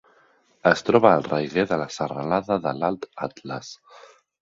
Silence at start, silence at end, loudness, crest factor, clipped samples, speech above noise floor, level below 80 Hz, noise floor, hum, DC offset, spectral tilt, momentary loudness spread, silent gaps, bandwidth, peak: 0.65 s; 0.65 s; -23 LUFS; 24 dB; under 0.1%; 37 dB; -60 dBFS; -60 dBFS; none; under 0.1%; -6 dB/octave; 17 LU; none; 7.8 kHz; 0 dBFS